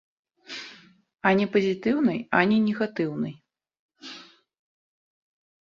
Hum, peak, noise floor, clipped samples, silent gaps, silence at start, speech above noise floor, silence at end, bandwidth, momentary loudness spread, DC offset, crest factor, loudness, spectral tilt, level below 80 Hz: none; -4 dBFS; -50 dBFS; under 0.1%; 3.79-3.89 s; 0.5 s; 27 dB; 1.45 s; 7.2 kHz; 20 LU; under 0.1%; 24 dB; -24 LUFS; -7 dB/octave; -68 dBFS